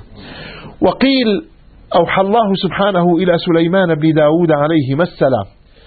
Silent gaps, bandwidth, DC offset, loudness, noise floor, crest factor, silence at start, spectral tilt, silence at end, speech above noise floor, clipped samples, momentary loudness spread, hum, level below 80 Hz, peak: none; 4.8 kHz; under 0.1%; -13 LUFS; -32 dBFS; 14 dB; 0.1 s; -12.5 dB/octave; 0.4 s; 20 dB; under 0.1%; 17 LU; none; -44 dBFS; 0 dBFS